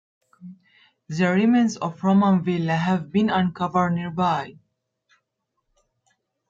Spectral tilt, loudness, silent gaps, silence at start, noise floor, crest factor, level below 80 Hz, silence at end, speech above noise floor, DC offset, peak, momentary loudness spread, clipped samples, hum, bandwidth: -7 dB/octave; -22 LUFS; none; 0.4 s; -77 dBFS; 16 dB; -62 dBFS; 2 s; 56 dB; under 0.1%; -8 dBFS; 6 LU; under 0.1%; none; 7.6 kHz